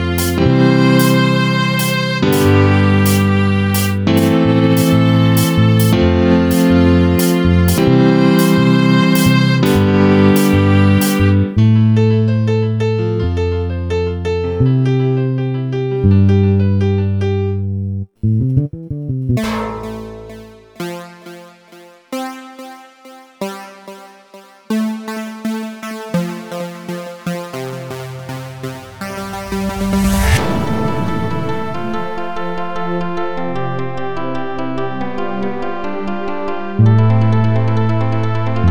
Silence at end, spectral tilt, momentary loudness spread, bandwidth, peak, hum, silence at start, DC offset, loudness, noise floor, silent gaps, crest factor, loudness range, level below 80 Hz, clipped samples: 0 s; -6.5 dB/octave; 15 LU; over 20 kHz; 0 dBFS; none; 0 s; under 0.1%; -14 LUFS; -42 dBFS; none; 14 dB; 14 LU; -34 dBFS; under 0.1%